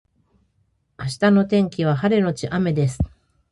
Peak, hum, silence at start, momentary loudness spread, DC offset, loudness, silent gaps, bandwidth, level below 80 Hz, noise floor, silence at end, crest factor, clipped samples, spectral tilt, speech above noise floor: -6 dBFS; none; 1 s; 11 LU; under 0.1%; -20 LUFS; none; 11.5 kHz; -42 dBFS; -66 dBFS; 0.45 s; 16 dB; under 0.1%; -7 dB/octave; 47 dB